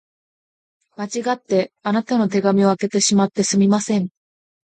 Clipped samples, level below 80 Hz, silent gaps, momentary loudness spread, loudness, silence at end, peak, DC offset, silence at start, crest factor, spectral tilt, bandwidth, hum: under 0.1%; -64 dBFS; none; 8 LU; -19 LUFS; 0.6 s; -4 dBFS; under 0.1%; 1 s; 16 dB; -5 dB/octave; 9.4 kHz; none